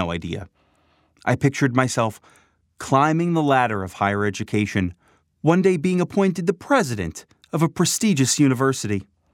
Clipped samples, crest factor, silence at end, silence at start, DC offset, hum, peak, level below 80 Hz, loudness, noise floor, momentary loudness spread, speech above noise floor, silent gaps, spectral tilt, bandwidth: under 0.1%; 20 dB; 0.3 s; 0 s; under 0.1%; none; -2 dBFS; -54 dBFS; -21 LUFS; -62 dBFS; 11 LU; 42 dB; none; -5 dB/octave; 17 kHz